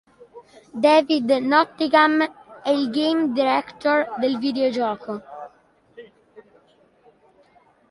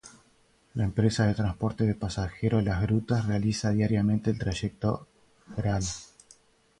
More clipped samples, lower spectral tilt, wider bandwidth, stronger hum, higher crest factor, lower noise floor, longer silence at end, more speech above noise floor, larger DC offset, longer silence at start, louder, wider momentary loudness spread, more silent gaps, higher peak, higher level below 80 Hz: neither; second, -5 dB/octave vs -6.5 dB/octave; about the same, 11.5 kHz vs 11 kHz; neither; about the same, 20 dB vs 18 dB; second, -57 dBFS vs -64 dBFS; first, 1.5 s vs 0.75 s; about the same, 38 dB vs 37 dB; neither; first, 0.35 s vs 0.05 s; first, -20 LUFS vs -28 LUFS; first, 15 LU vs 8 LU; neither; first, -2 dBFS vs -10 dBFS; second, -68 dBFS vs -46 dBFS